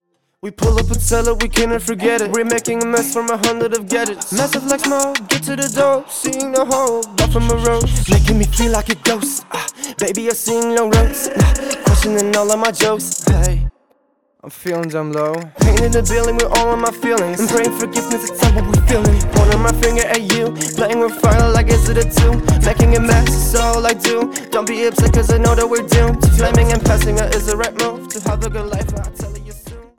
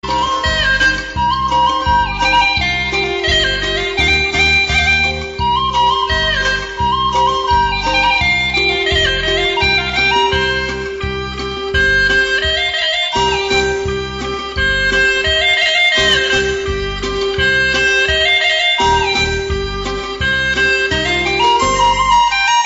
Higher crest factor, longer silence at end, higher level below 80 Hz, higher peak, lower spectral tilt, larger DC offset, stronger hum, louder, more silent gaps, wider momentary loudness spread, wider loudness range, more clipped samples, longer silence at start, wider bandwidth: about the same, 12 dB vs 10 dB; first, 0.15 s vs 0 s; first, -20 dBFS vs -28 dBFS; about the same, -2 dBFS vs -4 dBFS; first, -4.5 dB/octave vs -3 dB/octave; first, 0.3% vs under 0.1%; neither; about the same, -15 LUFS vs -13 LUFS; neither; about the same, 8 LU vs 8 LU; about the same, 3 LU vs 2 LU; neither; first, 0.45 s vs 0.05 s; first, 19 kHz vs 11 kHz